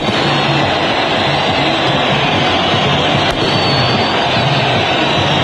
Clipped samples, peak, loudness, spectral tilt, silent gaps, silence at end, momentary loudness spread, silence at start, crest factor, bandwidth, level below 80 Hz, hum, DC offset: under 0.1%; 0 dBFS; -12 LUFS; -5 dB/octave; none; 0 s; 1 LU; 0 s; 12 dB; 12 kHz; -38 dBFS; none; under 0.1%